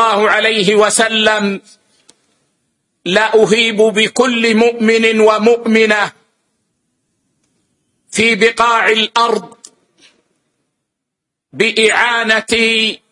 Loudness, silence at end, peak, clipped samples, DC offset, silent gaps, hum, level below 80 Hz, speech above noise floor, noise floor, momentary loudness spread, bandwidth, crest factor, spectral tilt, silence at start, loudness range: -11 LUFS; 0.15 s; 0 dBFS; under 0.1%; under 0.1%; none; none; -56 dBFS; 66 dB; -78 dBFS; 6 LU; 11.5 kHz; 14 dB; -3 dB/octave; 0 s; 5 LU